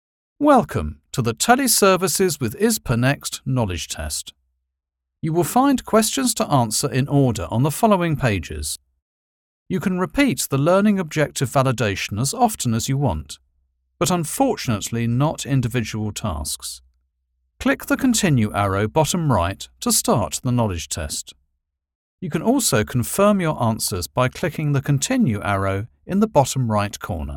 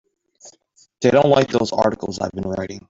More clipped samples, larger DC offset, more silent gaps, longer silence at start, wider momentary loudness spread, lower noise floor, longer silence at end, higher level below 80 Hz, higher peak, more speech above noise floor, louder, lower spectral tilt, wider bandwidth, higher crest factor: neither; neither; first, 9.02-9.66 s, 21.95-22.18 s vs none; about the same, 0.4 s vs 0.45 s; about the same, 10 LU vs 11 LU; first, -82 dBFS vs -55 dBFS; about the same, 0 s vs 0.1 s; first, -44 dBFS vs -52 dBFS; about the same, 0 dBFS vs -2 dBFS; first, 62 dB vs 36 dB; about the same, -20 LUFS vs -19 LUFS; about the same, -5 dB/octave vs -5.5 dB/octave; first, 18.5 kHz vs 7.8 kHz; about the same, 20 dB vs 18 dB